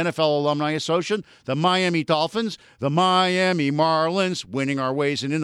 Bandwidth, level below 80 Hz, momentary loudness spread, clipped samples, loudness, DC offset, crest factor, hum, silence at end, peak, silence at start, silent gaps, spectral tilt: 12 kHz; -68 dBFS; 9 LU; under 0.1%; -22 LUFS; under 0.1%; 16 dB; none; 0 s; -6 dBFS; 0 s; none; -5 dB/octave